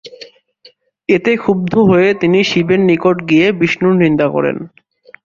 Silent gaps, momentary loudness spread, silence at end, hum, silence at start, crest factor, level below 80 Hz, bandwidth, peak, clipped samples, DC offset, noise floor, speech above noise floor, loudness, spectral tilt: none; 5 LU; 0.6 s; none; 0.05 s; 12 dB; -50 dBFS; 7.4 kHz; 0 dBFS; under 0.1%; under 0.1%; -48 dBFS; 36 dB; -12 LUFS; -7 dB/octave